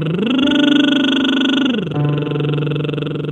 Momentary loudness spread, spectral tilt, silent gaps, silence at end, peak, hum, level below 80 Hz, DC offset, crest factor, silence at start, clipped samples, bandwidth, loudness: 7 LU; -6.5 dB/octave; none; 0 s; -2 dBFS; none; -54 dBFS; under 0.1%; 14 dB; 0 s; under 0.1%; 8.4 kHz; -16 LUFS